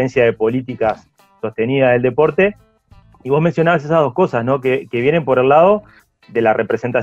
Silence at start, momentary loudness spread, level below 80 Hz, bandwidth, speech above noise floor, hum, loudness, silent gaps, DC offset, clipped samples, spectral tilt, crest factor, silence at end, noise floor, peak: 0 s; 8 LU; -50 dBFS; 7.6 kHz; 33 dB; none; -15 LUFS; none; under 0.1%; under 0.1%; -8 dB/octave; 14 dB; 0 s; -48 dBFS; -2 dBFS